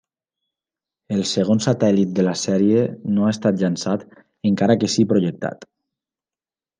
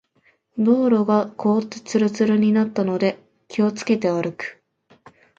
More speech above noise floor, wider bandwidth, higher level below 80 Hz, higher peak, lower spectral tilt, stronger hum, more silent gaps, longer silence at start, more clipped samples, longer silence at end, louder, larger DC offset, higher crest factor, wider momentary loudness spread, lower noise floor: first, over 71 dB vs 43 dB; first, 9.8 kHz vs 7.6 kHz; about the same, -66 dBFS vs -68 dBFS; about the same, -4 dBFS vs -6 dBFS; about the same, -6 dB/octave vs -6.5 dB/octave; neither; neither; first, 1.1 s vs 0.55 s; neither; first, 1.15 s vs 0.85 s; about the same, -20 LUFS vs -20 LUFS; neither; about the same, 16 dB vs 14 dB; second, 8 LU vs 12 LU; first, under -90 dBFS vs -62 dBFS